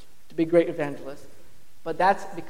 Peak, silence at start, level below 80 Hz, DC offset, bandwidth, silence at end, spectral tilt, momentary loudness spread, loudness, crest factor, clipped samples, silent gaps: -8 dBFS; 0.3 s; -62 dBFS; 2%; 15.5 kHz; 0 s; -6.5 dB/octave; 18 LU; -24 LUFS; 20 dB; under 0.1%; none